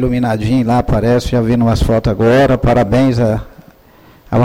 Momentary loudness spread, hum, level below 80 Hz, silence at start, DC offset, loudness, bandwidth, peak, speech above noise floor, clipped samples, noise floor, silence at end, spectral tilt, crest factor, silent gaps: 5 LU; none; -26 dBFS; 0 s; under 0.1%; -13 LUFS; 16 kHz; -4 dBFS; 32 dB; under 0.1%; -44 dBFS; 0 s; -7.5 dB/octave; 10 dB; none